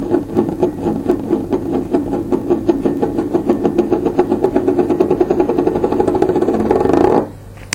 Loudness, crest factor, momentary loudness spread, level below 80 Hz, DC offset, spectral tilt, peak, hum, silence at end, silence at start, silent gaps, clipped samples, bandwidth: -16 LUFS; 16 dB; 4 LU; -38 dBFS; under 0.1%; -7.5 dB/octave; 0 dBFS; none; 0 s; 0 s; none; under 0.1%; 15.5 kHz